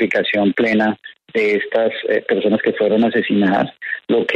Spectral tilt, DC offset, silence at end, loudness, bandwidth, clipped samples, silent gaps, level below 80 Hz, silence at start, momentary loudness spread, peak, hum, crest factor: -7 dB/octave; under 0.1%; 0 s; -17 LUFS; 7.6 kHz; under 0.1%; none; -62 dBFS; 0 s; 5 LU; -4 dBFS; none; 14 dB